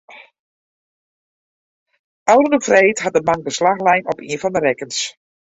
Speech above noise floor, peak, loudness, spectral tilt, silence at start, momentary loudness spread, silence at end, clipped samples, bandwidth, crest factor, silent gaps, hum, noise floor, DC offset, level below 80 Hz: over 74 dB; -2 dBFS; -16 LUFS; -3.5 dB/octave; 0.1 s; 10 LU; 0.5 s; under 0.1%; 8 kHz; 18 dB; 0.39-1.86 s, 1.99-2.26 s; none; under -90 dBFS; under 0.1%; -58 dBFS